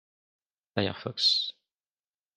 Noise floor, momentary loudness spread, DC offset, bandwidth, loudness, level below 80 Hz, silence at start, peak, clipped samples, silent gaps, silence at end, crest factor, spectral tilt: under -90 dBFS; 12 LU; under 0.1%; 13 kHz; -27 LUFS; -76 dBFS; 0.75 s; -8 dBFS; under 0.1%; none; 0.85 s; 24 dB; -3.5 dB/octave